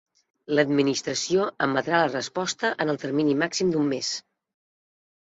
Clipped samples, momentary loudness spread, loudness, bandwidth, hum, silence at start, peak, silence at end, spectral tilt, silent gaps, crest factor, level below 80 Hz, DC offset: under 0.1%; 6 LU; -25 LUFS; 8 kHz; none; 0.5 s; -6 dBFS; 1.1 s; -4 dB/octave; none; 20 dB; -68 dBFS; under 0.1%